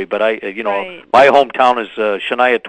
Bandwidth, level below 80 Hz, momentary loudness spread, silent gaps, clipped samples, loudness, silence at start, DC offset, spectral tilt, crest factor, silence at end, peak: 10 kHz; -56 dBFS; 10 LU; none; 0.3%; -14 LUFS; 0 s; under 0.1%; -4 dB/octave; 14 dB; 0 s; 0 dBFS